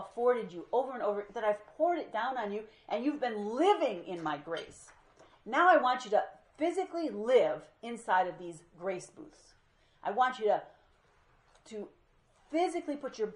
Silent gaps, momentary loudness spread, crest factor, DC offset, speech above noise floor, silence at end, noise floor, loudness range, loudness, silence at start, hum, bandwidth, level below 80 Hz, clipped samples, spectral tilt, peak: none; 16 LU; 20 dB; under 0.1%; 35 dB; 0 s; -67 dBFS; 6 LU; -32 LUFS; 0 s; none; 11 kHz; -74 dBFS; under 0.1%; -4.5 dB/octave; -12 dBFS